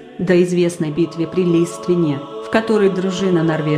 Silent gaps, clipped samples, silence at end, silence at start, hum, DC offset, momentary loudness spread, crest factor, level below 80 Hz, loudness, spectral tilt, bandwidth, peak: none; under 0.1%; 0 s; 0 s; none; under 0.1%; 5 LU; 14 dB; -54 dBFS; -17 LUFS; -6.5 dB/octave; 12.5 kHz; -2 dBFS